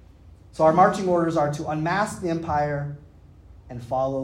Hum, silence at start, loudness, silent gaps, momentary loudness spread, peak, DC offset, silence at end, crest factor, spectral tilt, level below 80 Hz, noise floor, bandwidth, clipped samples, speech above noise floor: none; 0.25 s; -23 LUFS; none; 20 LU; -4 dBFS; under 0.1%; 0 s; 20 dB; -6.5 dB/octave; -50 dBFS; -48 dBFS; 14 kHz; under 0.1%; 26 dB